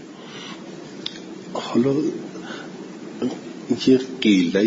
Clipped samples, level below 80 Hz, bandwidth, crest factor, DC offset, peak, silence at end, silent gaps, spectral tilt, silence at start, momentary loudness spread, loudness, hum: under 0.1%; -64 dBFS; 7.8 kHz; 18 dB; under 0.1%; -6 dBFS; 0 s; none; -5.5 dB/octave; 0 s; 18 LU; -22 LUFS; none